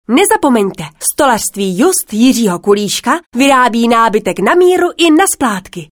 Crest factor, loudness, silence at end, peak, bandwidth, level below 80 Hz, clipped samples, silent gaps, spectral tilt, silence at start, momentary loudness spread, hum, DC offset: 10 dB; -11 LUFS; 0.1 s; 0 dBFS; over 20 kHz; -48 dBFS; under 0.1%; 3.26-3.32 s; -3.5 dB/octave; 0.1 s; 7 LU; none; under 0.1%